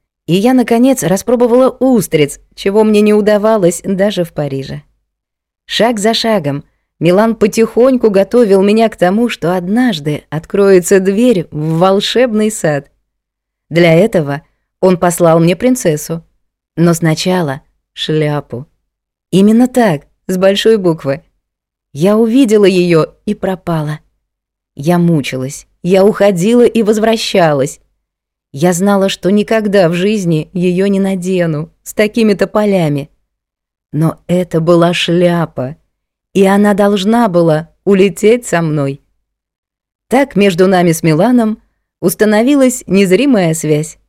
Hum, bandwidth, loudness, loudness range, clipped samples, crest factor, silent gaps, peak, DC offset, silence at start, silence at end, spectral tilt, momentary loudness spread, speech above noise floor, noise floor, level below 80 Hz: none; 16 kHz; -11 LUFS; 3 LU; 0.5%; 12 dB; 39.58-39.63 s, 39.95-39.99 s; 0 dBFS; under 0.1%; 0.3 s; 0.15 s; -6 dB/octave; 11 LU; 67 dB; -77 dBFS; -46 dBFS